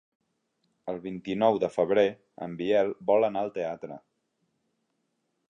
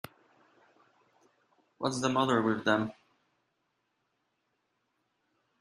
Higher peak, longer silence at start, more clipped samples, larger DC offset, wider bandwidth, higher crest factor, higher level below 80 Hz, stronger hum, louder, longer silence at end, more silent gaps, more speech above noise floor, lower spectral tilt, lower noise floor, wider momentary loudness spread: first, -8 dBFS vs -12 dBFS; second, 0.85 s vs 1.8 s; neither; neither; second, 9.6 kHz vs 14 kHz; about the same, 22 dB vs 24 dB; about the same, -70 dBFS vs -74 dBFS; neither; first, -27 LUFS vs -30 LUFS; second, 1.5 s vs 2.7 s; neither; about the same, 50 dB vs 50 dB; first, -7 dB/octave vs -5 dB/octave; about the same, -77 dBFS vs -79 dBFS; first, 16 LU vs 11 LU